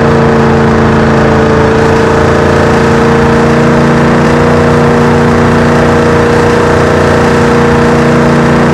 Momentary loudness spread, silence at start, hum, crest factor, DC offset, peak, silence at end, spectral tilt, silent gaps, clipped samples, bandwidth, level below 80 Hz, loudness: 0 LU; 0 s; none; 6 dB; under 0.1%; 0 dBFS; 0 s; -6.5 dB/octave; none; 6%; 12.5 kHz; -24 dBFS; -6 LUFS